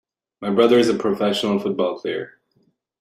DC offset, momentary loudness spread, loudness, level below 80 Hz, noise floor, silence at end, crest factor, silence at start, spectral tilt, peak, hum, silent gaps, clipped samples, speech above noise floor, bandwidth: under 0.1%; 14 LU; -20 LUFS; -62 dBFS; -65 dBFS; 0.7 s; 18 dB; 0.4 s; -5.5 dB/octave; -2 dBFS; none; none; under 0.1%; 46 dB; 14.5 kHz